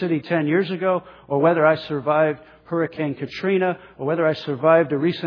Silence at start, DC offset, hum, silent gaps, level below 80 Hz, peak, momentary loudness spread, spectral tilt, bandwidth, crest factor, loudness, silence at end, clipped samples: 0 s; under 0.1%; none; none; -64 dBFS; -2 dBFS; 9 LU; -8.5 dB/octave; 5.4 kHz; 18 dB; -21 LUFS; 0 s; under 0.1%